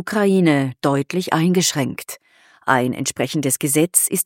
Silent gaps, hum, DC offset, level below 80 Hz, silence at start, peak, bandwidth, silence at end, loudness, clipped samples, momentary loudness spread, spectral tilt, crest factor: none; none; under 0.1%; -66 dBFS; 0 s; 0 dBFS; 17 kHz; 0 s; -18 LUFS; under 0.1%; 11 LU; -4 dB/octave; 18 dB